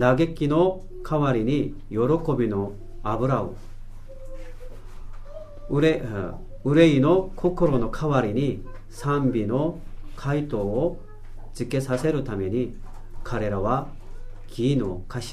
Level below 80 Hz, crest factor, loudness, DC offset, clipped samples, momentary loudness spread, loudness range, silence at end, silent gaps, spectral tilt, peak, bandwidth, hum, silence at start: -36 dBFS; 18 dB; -24 LUFS; under 0.1%; under 0.1%; 22 LU; 7 LU; 0 s; none; -7.5 dB/octave; -6 dBFS; 13.5 kHz; none; 0 s